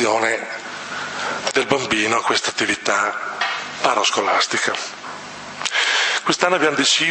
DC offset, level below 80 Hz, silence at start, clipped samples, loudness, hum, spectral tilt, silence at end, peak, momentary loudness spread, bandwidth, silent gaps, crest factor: under 0.1%; -64 dBFS; 0 s; under 0.1%; -19 LUFS; none; -1.5 dB/octave; 0 s; 0 dBFS; 12 LU; 8.8 kHz; none; 20 dB